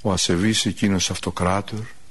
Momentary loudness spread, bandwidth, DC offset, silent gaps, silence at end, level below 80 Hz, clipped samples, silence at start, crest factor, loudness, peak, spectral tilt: 9 LU; 12 kHz; 1%; none; 0.2 s; -44 dBFS; under 0.1%; 0.05 s; 16 dB; -21 LUFS; -6 dBFS; -4 dB/octave